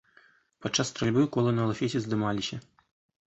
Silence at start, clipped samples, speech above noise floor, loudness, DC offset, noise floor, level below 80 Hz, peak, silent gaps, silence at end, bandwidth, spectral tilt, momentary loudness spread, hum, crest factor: 0.6 s; under 0.1%; 34 dB; -28 LUFS; under 0.1%; -62 dBFS; -60 dBFS; -12 dBFS; none; 0.65 s; 8.2 kHz; -5 dB/octave; 10 LU; none; 18 dB